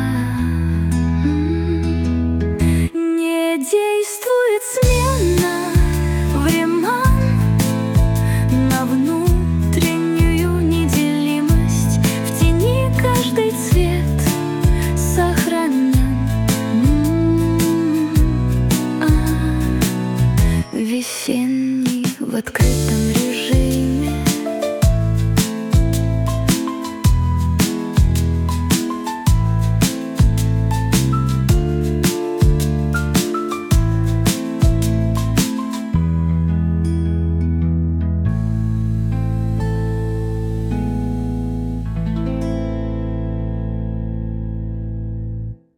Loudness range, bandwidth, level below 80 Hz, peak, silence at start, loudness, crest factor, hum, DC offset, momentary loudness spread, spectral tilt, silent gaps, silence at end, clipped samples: 5 LU; 19 kHz; -24 dBFS; -4 dBFS; 0 s; -18 LUFS; 14 dB; none; under 0.1%; 6 LU; -6 dB/octave; none; 0.2 s; under 0.1%